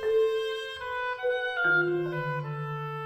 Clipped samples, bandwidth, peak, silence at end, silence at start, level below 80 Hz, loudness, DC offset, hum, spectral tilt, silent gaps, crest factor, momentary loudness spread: under 0.1%; 14.5 kHz; -16 dBFS; 0 s; 0 s; -64 dBFS; -29 LUFS; under 0.1%; none; -6.5 dB/octave; none; 14 dB; 10 LU